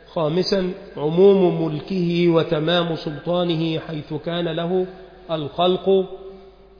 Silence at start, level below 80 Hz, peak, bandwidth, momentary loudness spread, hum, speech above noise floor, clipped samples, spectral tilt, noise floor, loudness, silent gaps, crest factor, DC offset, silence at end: 0.1 s; -52 dBFS; -4 dBFS; 5.2 kHz; 12 LU; none; 23 dB; under 0.1%; -7.5 dB/octave; -43 dBFS; -21 LUFS; none; 16 dB; under 0.1%; 0.3 s